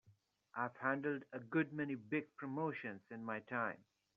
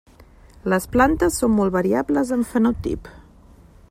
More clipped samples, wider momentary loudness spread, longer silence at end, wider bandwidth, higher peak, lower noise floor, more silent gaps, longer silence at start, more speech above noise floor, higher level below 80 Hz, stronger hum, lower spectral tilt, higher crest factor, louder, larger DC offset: neither; about the same, 9 LU vs 10 LU; second, 0.4 s vs 0.7 s; second, 5.6 kHz vs 15.5 kHz; second, -22 dBFS vs -4 dBFS; first, -73 dBFS vs -48 dBFS; neither; second, 0.05 s vs 0.65 s; about the same, 31 dB vs 29 dB; second, -88 dBFS vs -40 dBFS; neither; about the same, -6 dB/octave vs -6 dB/octave; about the same, 20 dB vs 16 dB; second, -42 LUFS vs -20 LUFS; neither